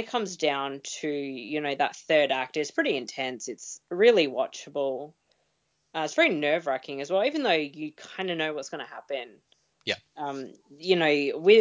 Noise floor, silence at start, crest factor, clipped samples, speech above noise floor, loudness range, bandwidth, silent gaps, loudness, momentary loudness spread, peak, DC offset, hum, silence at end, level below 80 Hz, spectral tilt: -74 dBFS; 0 s; 20 dB; under 0.1%; 47 dB; 5 LU; 7.6 kHz; none; -27 LUFS; 15 LU; -6 dBFS; under 0.1%; none; 0 s; -78 dBFS; -3.5 dB/octave